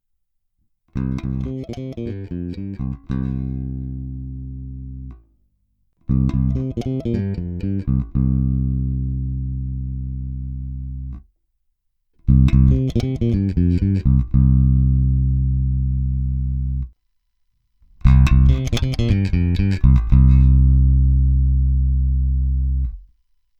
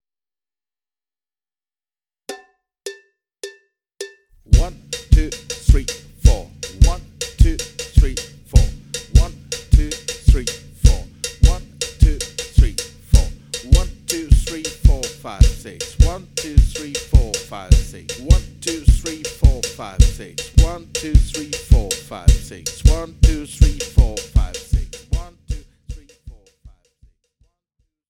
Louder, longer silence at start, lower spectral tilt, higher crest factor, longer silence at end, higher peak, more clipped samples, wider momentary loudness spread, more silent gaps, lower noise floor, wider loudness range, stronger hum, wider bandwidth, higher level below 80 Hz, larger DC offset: about the same, -19 LUFS vs -19 LUFS; second, 0.95 s vs 2.3 s; first, -9 dB/octave vs -5 dB/octave; about the same, 18 dB vs 16 dB; second, 0.55 s vs 1.8 s; about the same, 0 dBFS vs 0 dBFS; neither; about the same, 16 LU vs 14 LU; neither; second, -69 dBFS vs under -90 dBFS; first, 12 LU vs 7 LU; neither; second, 6.8 kHz vs 14 kHz; about the same, -20 dBFS vs -18 dBFS; neither